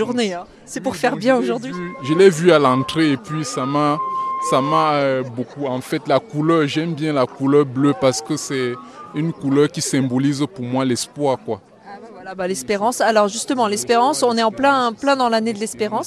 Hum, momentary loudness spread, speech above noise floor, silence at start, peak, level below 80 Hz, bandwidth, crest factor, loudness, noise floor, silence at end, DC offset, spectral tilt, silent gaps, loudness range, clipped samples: none; 10 LU; 20 dB; 0 s; 0 dBFS; -60 dBFS; 13.5 kHz; 18 dB; -18 LUFS; -38 dBFS; 0 s; under 0.1%; -5 dB/octave; none; 4 LU; under 0.1%